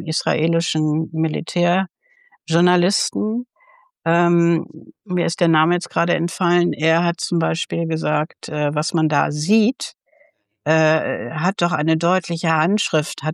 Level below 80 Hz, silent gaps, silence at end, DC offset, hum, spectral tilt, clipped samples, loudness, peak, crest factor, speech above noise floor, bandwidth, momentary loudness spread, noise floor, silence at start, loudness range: -70 dBFS; none; 0 s; under 0.1%; none; -5.5 dB/octave; under 0.1%; -19 LUFS; -4 dBFS; 16 dB; 40 dB; 12.5 kHz; 8 LU; -58 dBFS; 0 s; 2 LU